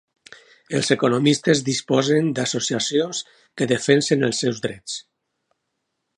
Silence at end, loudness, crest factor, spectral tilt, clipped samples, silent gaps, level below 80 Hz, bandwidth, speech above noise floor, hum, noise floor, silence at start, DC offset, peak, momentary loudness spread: 1.15 s; -21 LUFS; 20 dB; -4.5 dB/octave; under 0.1%; none; -64 dBFS; 11.5 kHz; 56 dB; none; -77 dBFS; 0.7 s; under 0.1%; -2 dBFS; 12 LU